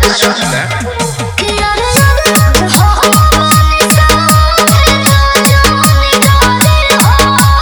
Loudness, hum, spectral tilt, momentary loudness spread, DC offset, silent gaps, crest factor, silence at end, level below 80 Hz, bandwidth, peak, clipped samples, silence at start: -7 LUFS; none; -4 dB/octave; 6 LU; under 0.1%; none; 8 dB; 0 s; -14 dBFS; over 20 kHz; 0 dBFS; 1%; 0 s